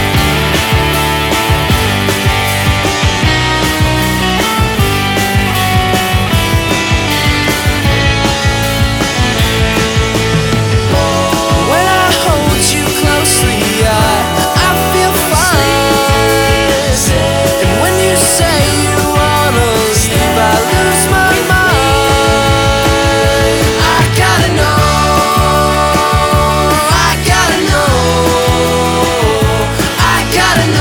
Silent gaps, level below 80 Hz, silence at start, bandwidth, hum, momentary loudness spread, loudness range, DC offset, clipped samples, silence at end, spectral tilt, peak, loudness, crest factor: none; -22 dBFS; 0 s; over 20 kHz; none; 3 LU; 2 LU; under 0.1%; under 0.1%; 0 s; -4 dB/octave; 0 dBFS; -10 LUFS; 10 dB